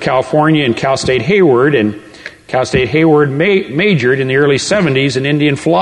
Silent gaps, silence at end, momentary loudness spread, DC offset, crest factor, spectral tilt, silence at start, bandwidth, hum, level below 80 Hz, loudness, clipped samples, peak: none; 0 s; 6 LU; under 0.1%; 10 dB; -5.5 dB/octave; 0 s; 11 kHz; none; -42 dBFS; -12 LUFS; under 0.1%; 0 dBFS